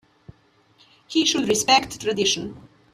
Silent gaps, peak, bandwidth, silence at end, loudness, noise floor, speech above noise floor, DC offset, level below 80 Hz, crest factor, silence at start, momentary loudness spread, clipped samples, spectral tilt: none; -4 dBFS; 15 kHz; 0.3 s; -20 LUFS; -59 dBFS; 38 dB; under 0.1%; -58 dBFS; 20 dB; 1.1 s; 9 LU; under 0.1%; -2 dB/octave